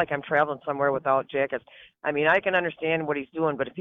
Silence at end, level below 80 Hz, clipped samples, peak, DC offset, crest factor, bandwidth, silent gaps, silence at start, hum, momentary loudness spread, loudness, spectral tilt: 0 s; -64 dBFS; under 0.1%; -8 dBFS; under 0.1%; 18 dB; 4.1 kHz; none; 0 s; none; 8 LU; -25 LUFS; -7.5 dB/octave